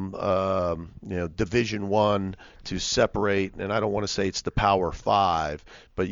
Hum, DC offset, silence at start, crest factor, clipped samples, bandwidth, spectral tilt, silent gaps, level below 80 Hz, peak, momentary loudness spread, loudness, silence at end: none; under 0.1%; 0 s; 18 dB; under 0.1%; 7.6 kHz; -5 dB/octave; none; -44 dBFS; -8 dBFS; 11 LU; -26 LUFS; 0 s